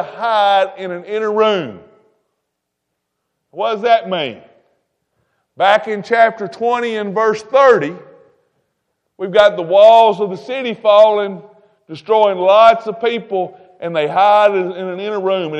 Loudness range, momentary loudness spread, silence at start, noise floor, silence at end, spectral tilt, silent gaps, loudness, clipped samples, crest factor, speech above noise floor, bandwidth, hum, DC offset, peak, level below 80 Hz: 9 LU; 14 LU; 0 s; -75 dBFS; 0 s; -5 dB/octave; none; -14 LUFS; under 0.1%; 16 dB; 61 dB; 8.4 kHz; none; under 0.1%; 0 dBFS; -64 dBFS